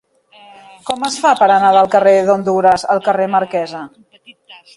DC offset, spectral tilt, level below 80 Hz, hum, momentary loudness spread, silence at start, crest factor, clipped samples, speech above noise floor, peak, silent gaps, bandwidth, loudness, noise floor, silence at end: under 0.1%; -4.5 dB/octave; -56 dBFS; none; 15 LU; 0.85 s; 14 dB; under 0.1%; 32 dB; 0 dBFS; none; 11.5 kHz; -13 LUFS; -44 dBFS; 0.25 s